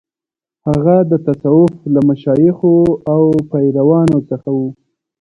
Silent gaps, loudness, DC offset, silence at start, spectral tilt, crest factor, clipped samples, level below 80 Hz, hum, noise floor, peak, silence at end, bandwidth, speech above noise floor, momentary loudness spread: none; -13 LUFS; under 0.1%; 0.65 s; -10.5 dB/octave; 12 dB; under 0.1%; -46 dBFS; none; -89 dBFS; 0 dBFS; 0.5 s; 8 kHz; 77 dB; 8 LU